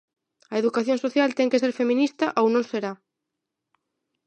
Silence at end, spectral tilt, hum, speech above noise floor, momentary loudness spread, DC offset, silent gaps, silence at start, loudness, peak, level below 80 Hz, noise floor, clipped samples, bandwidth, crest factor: 1.3 s; -5 dB/octave; none; 61 dB; 8 LU; under 0.1%; none; 0.5 s; -23 LUFS; -8 dBFS; -80 dBFS; -83 dBFS; under 0.1%; 9 kHz; 18 dB